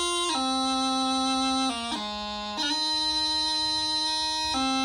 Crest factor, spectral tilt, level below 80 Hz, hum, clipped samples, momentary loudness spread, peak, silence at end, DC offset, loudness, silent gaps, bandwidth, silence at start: 12 dB; -1.5 dB/octave; -54 dBFS; none; under 0.1%; 7 LU; -14 dBFS; 0 s; under 0.1%; -25 LUFS; none; 16 kHz; 0 s